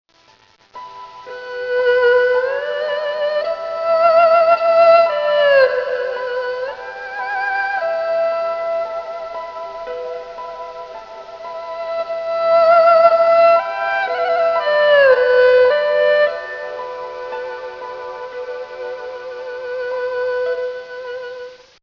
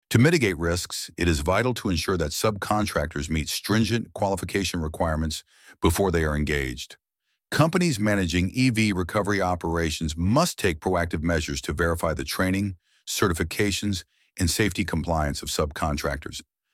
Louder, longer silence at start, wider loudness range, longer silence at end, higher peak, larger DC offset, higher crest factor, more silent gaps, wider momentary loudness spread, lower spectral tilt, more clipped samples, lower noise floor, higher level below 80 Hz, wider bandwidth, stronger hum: first, -16 LUFS vs -25 LUFS; first, 0.75 s vs 0.1 s; first, 13 LU vs 2 LU; about the same, 0.25 s vs 0.3 s; first, 0 dBFS vs -6 dBFS; neither; about the same, 16 dB vs 20 dB; neither; first, 19 LU vs 8 LU; second, -3 dB/octave vs -5 dB/octave; neither; second, -52 dBFS vs -79 dBFS; second, -62 dBFS vs -38 dBFS; second, 6 kHz vs 16.5 kHz; neither